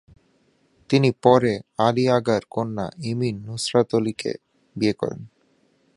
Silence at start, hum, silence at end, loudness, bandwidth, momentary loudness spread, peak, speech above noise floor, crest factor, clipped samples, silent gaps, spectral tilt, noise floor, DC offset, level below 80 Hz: 0.9 s; none; 0.7 s; -22 LUFS; 11.5 kHz; 13 LU; -2 dBFS; 42 dB; 22 dB; under 0.1%; none; -6 dB/octave; -63 dBFS; under 0.1%; -58 dBFS